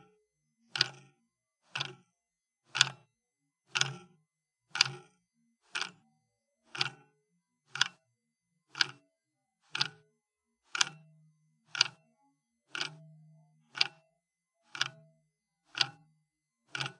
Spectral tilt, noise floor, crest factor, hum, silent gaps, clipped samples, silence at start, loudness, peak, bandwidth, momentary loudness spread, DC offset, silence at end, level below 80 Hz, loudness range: 0 dB/octave; -88 dBFS; 34 dB; none; none; under 0.1%; 0.75 s; -33 LUFS; -4 dBFS; 11.5 kHz; 15 LU; under 0.1%; 0.05 s; under -90 dBFS; 5 LU